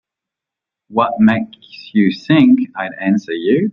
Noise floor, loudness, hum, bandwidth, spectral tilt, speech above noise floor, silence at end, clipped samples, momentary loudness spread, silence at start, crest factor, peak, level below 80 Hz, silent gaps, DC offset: -85 dBFS; -15 LUFS; none; 6.8 kHz; -8 dB/octave; 70 dB; 0 s; under 0.1%; 11 LU; 0.9 s; 14 dB; -2 dBFS; -56 dBFS; none; under 0.1%